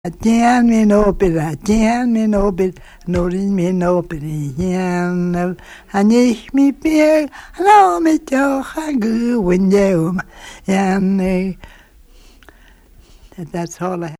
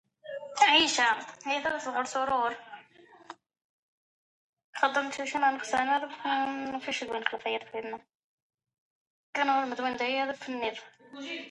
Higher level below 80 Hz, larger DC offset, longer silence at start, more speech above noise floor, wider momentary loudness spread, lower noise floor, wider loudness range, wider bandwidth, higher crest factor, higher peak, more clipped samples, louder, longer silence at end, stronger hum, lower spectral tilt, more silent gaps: first, -36 dBFS vs -72 dBFS; neither; second, 0.05 s vs 0.25 s; first, 30 dB vs 26 dB; second, 13 LU vs 18 LU; second, -45 dBFS vs -57 dBFS; about the same, 7 LU vs 7 LU; first, 15.5 kHz vs 11 kHz; second, 16 dB vs 24 dB; first, 0 dBFS vs -8 dBFS; neither; first, -16 LUFS vs -29 LUFS; about the same, 0.05 s vs 0 s; neither; first, -6.5 dB/octave vs -1 dB/octave; second, none vs 3.64-4.53 s, 4.64-4.73 s, 8.15-8.58 s, 8.78-9.33 s